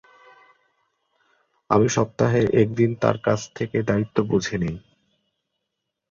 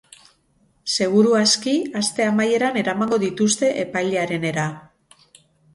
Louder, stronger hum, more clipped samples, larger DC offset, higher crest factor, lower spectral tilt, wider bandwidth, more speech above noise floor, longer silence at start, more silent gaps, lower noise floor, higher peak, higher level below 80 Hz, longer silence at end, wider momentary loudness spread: about the same, -22 LUFS vs -20 LUFS; neither; neither; neither; first, 22 dB vs 16 dB; first, -6.5 dB/octave vs -4 dB/octave; second, 7.6 kHz vs 11.5 kHz; first, 60 dB vs 42 dB; first, 1.7 s vs 0.85 s; neither; first, -81 dBFS vs -62 dBFS; about the same, -2 dBFS vs -4 dBFS; first, -52 dBFS vs -64 dBFS; first, 1.3 s vs 0.95 s; about the same, 8 LU vs 8 LU